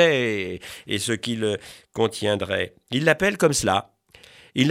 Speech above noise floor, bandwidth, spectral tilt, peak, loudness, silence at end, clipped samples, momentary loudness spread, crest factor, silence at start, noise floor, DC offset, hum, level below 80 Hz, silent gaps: 27 dB; 16 kHz; -4 dB/octave; -2 dBFS; -23 LUFS; 0 s; under 0.1%; 12 LU; 20 dB; 0 s; -50 dBFS; under 0.1%; none; -56 dBFS; none